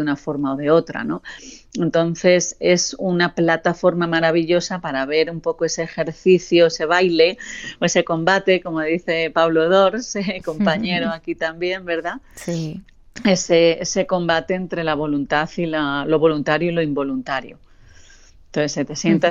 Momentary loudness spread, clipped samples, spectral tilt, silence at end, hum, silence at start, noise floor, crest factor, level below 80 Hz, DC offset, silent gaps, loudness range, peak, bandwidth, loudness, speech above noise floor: 10 LU; under 0.1%; -4.5 dB/octave; 0 s; none; 0 s; -46 dBFS; 16 dB; -50 dBFS; under 0.1%; none; 4 LU; -2 dBFS; 10 kHz; -19 LUFS; 27 dB